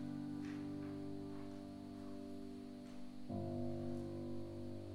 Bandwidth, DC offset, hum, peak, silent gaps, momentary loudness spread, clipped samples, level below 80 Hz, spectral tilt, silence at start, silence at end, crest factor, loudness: 15 kHz; under 0.1%; none; -32 dBFS; none; 7 LU; under 0.1%; -68 dBFS; -8 dB/octave; 0 s; 0 s; 14 dB; -48 LUFS